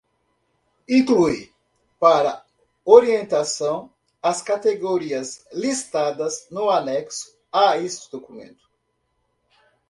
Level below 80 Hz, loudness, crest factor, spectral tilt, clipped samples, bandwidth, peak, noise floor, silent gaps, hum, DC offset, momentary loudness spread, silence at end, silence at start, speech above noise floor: -62 dBFS; -20 LUFS; 22 dB; -4 dB/octave; under 0.1%; 11.5 kHz; 0 dBFS; -72 dBFS; none; none; under 0.1%; 16 LU; 1.45 s; 0.9 s; 52 dB